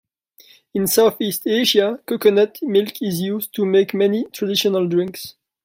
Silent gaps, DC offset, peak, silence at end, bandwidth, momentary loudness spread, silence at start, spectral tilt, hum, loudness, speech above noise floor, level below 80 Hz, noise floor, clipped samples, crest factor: none; under 0.1%; -2 dBFS; 0.35 s; 16.5 kHz; 8 LU; 0.75 s; -4.5 dB/octave; none; -18 LUFS; 34 dB; -64 dBFS; -52 dBFS; under 0.1%; 16 dB